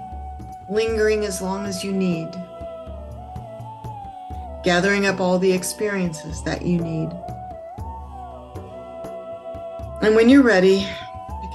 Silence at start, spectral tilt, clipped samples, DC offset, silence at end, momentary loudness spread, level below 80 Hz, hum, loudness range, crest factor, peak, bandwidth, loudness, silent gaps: 0 s; -5.5 dB/octave; under 0.1%; under 0.1%; 0 s; 20 LU; -40 dBFS; none; 10 LU; 18 dB; -4 dBFS; 12.5 kHz; -20 LUFS; none